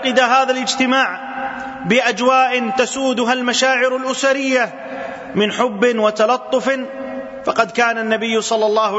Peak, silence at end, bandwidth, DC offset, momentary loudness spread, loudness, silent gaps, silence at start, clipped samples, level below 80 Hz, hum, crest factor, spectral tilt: -2 dBFS; 0 s; 8 kHz; under 0.1%; 11 LU; -16 LUFS; none; 0 s; under 0.1%; -60 dBFS; none; 16 dB; -3 dB/octave